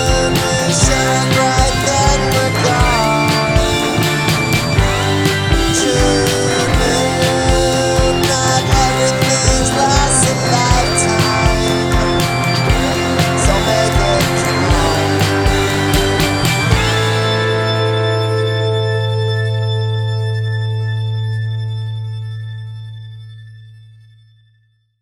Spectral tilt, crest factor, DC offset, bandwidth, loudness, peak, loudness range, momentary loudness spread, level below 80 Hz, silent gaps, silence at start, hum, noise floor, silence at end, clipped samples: -4 dB/octave; 14 dB; under 0.1%; 18.5 kHz; -14 LUFS; 0 dBFS; 8 LU; 7 LU; -24 dBFS; none; 0 s; none; -57 dBFS; 1.25 s; under 0.1%